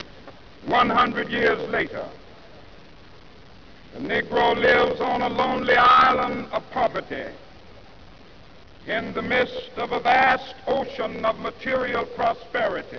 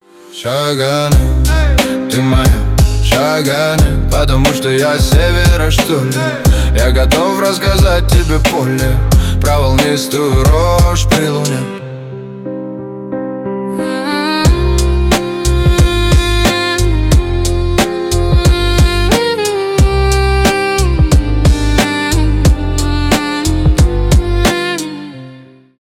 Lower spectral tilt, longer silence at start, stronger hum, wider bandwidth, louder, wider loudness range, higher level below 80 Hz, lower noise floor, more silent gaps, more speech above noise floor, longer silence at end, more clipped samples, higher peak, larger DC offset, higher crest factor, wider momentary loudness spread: about the same, -5.5 dB/octave vs -5 dB/octave; second, 0 s vs 0.3 s; neither; second, 5.4 kHz vs 16.5 kHz; second, -22 LUFS vs -12 LUFS; first, 9 LU vs 3 LU; second, -50 dBFS vs -14 dBFS; first, -48 dBFS vs -37 dBFS; neither; about the same, 26 dB vs 27 dB; second, 0 s vs 0.4 s; neither; second, -6 dBFS vs -2 dBFS; first, 0.4% vs under 0.1%; first, 18 dB vs 10 dB; first, 14 LU vs 9 LU